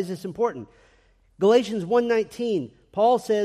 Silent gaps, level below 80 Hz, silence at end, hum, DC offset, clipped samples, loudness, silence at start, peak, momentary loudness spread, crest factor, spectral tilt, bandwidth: none; -62 dBFS; 0 s; none; under 0.1%; under 0.1%; -23 LUFS; 0 s; -8 dBFS; 10 LU; 16 dB; -6 dB/octave; 13.5 kHz